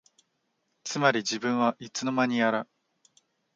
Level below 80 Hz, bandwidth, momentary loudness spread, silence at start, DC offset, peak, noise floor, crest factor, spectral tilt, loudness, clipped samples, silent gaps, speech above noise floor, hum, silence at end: -80 dBFS; 7.8 kHz; 10 LU; 0.85 s; under 0.1%; -8 dBFS; -76 dBFS; 22 dB; -4 dB/octave; -27 LUFS; under 0.1%; none; 50 dB; none; 0.9 s